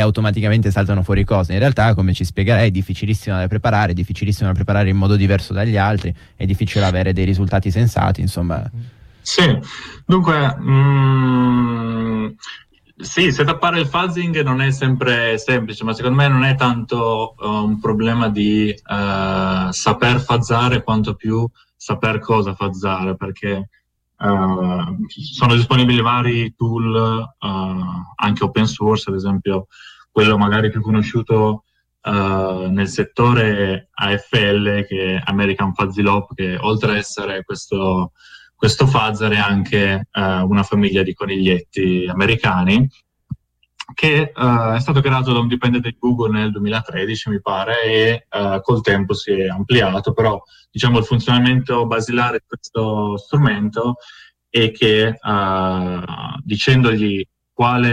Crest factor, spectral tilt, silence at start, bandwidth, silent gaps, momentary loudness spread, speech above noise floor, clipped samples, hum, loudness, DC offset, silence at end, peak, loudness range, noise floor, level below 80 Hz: 14 dB; -6.5 dB/octave; 0 s; 12.5 kHz; none; 9 LU; 22 dB; under 0.1%; none; -17 LUFS; under 0.1%; 0 s; -2 dBFS; 2 LU; -38 dBFS; -38 dBFS